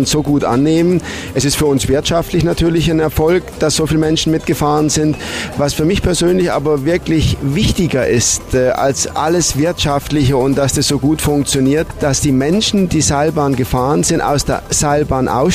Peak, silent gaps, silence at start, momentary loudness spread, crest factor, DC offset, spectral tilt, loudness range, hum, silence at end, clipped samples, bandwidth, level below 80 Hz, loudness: -2 dBFS; none; 0 s; 3 LU; 12 dB; under 0.1%; -4.5 dB/octave; 1 LU; none; 0 s; under 0.1%; 15.5 kHz; -30 dBFS; -14 LUFS